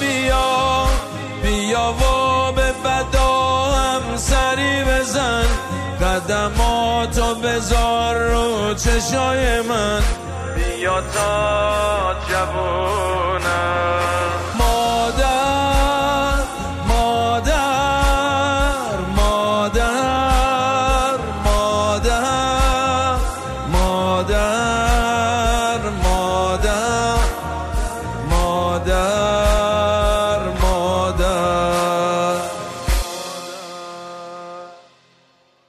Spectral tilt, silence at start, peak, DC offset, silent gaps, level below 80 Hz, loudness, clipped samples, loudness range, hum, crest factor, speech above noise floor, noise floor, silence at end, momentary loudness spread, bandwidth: -4 dB/octave; 0 s; -4 dBFS; under 0.1%; none; -24 dBFS; -18 LUFS; under 0.1%; 2 LU; none; 14 dB; 39 dB; -57 dBFS; 0.9 s; 7 LU; 14 kHz